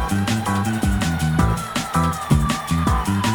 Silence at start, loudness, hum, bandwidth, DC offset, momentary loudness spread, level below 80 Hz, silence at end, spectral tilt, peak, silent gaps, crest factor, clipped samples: 0 s; -20 LUFS; none; over 20 kHz; under 0.1%; 2 LU; -28 dBFS; 0 s; -5.5 dB/octave; -6 dBFS; none; 14 dB; under 0.1%